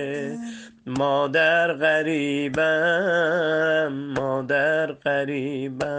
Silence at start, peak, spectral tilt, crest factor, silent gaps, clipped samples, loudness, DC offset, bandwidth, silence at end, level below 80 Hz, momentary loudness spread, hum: 0 s; -8 dBFS; -5.5 dB/octave; 16 dB; none; under 0.1%; -22 LUFS; under 0.1%; 9.4 kHz; 0 s; -60 dBFS; 10 LU; none